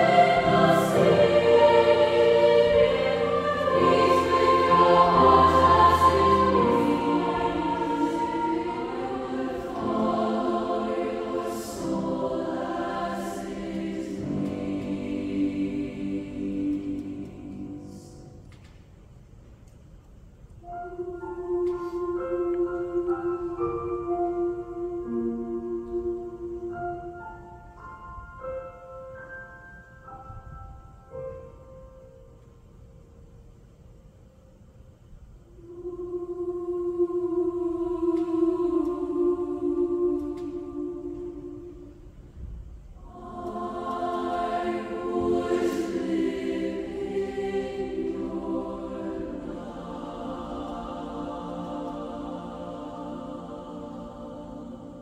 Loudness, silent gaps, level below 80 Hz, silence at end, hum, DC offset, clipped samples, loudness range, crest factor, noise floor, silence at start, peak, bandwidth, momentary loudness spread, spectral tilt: -25 LUFS; none; -48 dBFS; 0 s; none; under 0.1%; under 0.1%; 22 LU; 20 dB; -52 dBFS; 0 s; -6 dBFS; 15 kHz; 22 LU; -6.5 dB/octave